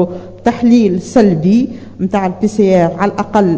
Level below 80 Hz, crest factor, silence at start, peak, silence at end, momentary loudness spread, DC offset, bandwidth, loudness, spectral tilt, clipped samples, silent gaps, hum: -44 dBFS; 12 dB; 0 s; 0 dBFS; 0 s; 7 LU; under 0.1%; 8 kHz; -13 LUFS; -7.5 dB/octave; 0.4%; none; none